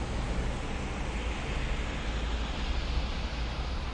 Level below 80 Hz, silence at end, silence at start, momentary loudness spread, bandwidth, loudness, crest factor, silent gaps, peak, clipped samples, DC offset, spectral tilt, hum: -34 dBFS; 0 s; 0 s; 2 LU; 10 kHz; -35 LUFS; 14 dB; none; -18 dBFS; under 0.1%; under 0.1%; -5 dB/octave; none